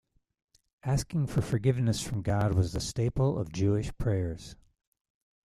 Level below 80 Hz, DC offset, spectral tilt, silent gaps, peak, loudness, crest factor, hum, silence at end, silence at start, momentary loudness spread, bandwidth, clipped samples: -46 dBFS; under 0.1%; -6.5 dB/octave; none; -14 dBFS; -30 LUFS; 18 dB; none; 0.9 s; 0.85 s; 5 LU; 13.5 kHz; under 0.1%